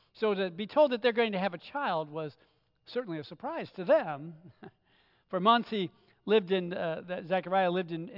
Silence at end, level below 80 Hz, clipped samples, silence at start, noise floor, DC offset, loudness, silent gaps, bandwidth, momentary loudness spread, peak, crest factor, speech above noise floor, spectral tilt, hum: 0 s; -80 dBFS; under 0.1%; 0.15 s; -68 dBFS; under 0.1%; -31 LUFS; none; 5.8 kHz; 14 LU; -14 dBFS; 18 dB; 38 dB; -8 dB/octave; none